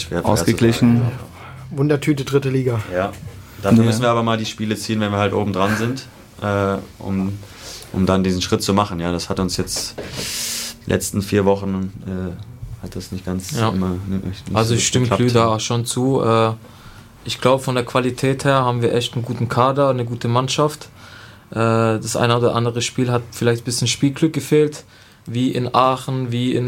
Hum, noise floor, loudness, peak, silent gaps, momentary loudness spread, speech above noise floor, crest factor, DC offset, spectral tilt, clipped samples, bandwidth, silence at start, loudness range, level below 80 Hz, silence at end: none; -41 dBFS; -19 LUFS; 0 dBFS; none; 13 LU; 22 dB; 18 dB; under 0.1%; -5.5 dB/octave; under 0.1%; 17 kHz; 0 s; 4 LU; -46 dBFS; 0 s